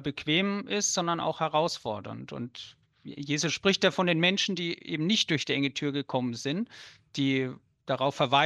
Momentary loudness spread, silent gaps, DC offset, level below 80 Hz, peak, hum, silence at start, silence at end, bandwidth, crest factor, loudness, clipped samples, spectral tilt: 15 LU; none; under 0.1%; -70 dBFS; -10 dBFS; none; 0 s; 0 s; 12.5 kHz; 20 dB; -28 LUFS; under 0.1%; -3.5 dB/octave